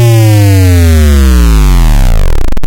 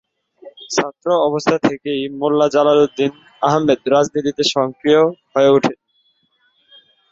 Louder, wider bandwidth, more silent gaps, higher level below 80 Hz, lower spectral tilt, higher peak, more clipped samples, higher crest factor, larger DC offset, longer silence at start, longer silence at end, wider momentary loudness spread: first, -7 LUFS vs -16 LUFS; first, 17 kHz vs 8 kHz; neither; first, -6 dBFS vs -58 dBFS; about the same, -6 dB/octave vs -5 dB/octave; about the same, 0 dBFS vs -2 dBFS; neither; second, 4 dB vs 16 dB; neither; second, 0 s vs 0.45 s; second, 0 s vs 1.35 s; about the same, 6 LU vs 8 LU